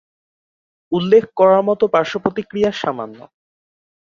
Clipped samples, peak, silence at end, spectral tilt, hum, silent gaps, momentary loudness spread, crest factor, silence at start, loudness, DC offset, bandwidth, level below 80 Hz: under 0.1%; -2 dBFS; 0.95 s; -6.5 dB/octave; none; none; 11 LU; 16 dB; 0.9 s; -16 LUFS; under 0.1%; 7.2 kHz; -60 dBFS